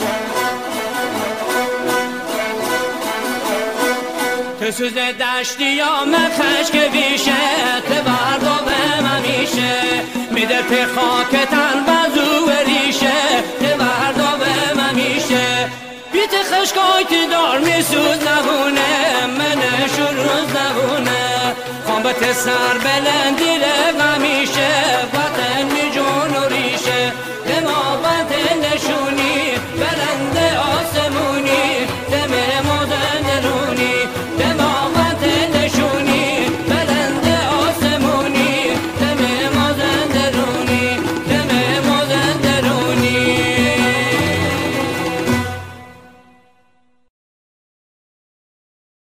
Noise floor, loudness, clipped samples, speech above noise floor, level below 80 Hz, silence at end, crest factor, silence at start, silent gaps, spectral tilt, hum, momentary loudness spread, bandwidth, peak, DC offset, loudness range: -60 dBFS; -16 LUFS; under 0.1%; 45 dB; -48 dBFS; 3.05 s; 14 dB; 0 s; none; -3.5 dB/octave; none; 6 LU; 16 kHz; -2 dBFS; under 0.1%; 4 LU